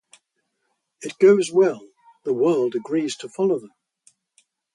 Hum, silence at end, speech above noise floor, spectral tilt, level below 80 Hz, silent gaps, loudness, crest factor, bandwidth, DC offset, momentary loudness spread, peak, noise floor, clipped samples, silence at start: none; 1.1 s; 55 dB; -5.5 dB/octave; -72 dBFS; none; -21 LUFS; 18 dB; 11.5 kHz; under 0.1%; 18 LU; -4 dBFS; -74 dBFS; under 0.1%; 1 s